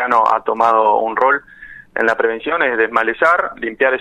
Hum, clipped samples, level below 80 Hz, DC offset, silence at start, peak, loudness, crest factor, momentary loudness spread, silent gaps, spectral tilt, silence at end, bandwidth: none; under 0.1%; -54 dBFS; under 0.1%; 0 s; -2 dBFS; -15 LUFS; 14 dB; 5 LU; none; -4.5 dB/octave; 0 s; 10.5 kHz